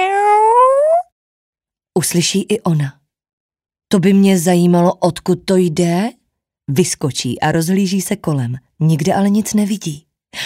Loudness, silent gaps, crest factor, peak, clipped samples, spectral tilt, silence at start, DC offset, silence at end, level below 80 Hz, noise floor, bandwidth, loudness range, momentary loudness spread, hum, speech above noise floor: -15 LUFS; 1.12-1.53 s, 3.33-3.49 s; 14 dB; -2 dBFS; under 0.1%; -5.5 dB/octave; 0 s; under 0.1%; 0 s; -52 dBFS; -71 dBFS; 16 kHz; 3 LU; 10 LU; none; 56 dB